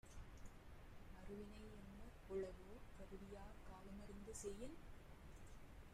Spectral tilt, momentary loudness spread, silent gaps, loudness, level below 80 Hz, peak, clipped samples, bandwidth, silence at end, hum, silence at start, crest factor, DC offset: -5 dB/octave; 12 LU; none; -58 LUFS; -62 dBFS; -38 dBFS; under 0.1%; 15.5 kHz; 0 s; none; 0.05 s; 18 dB; under 0.1%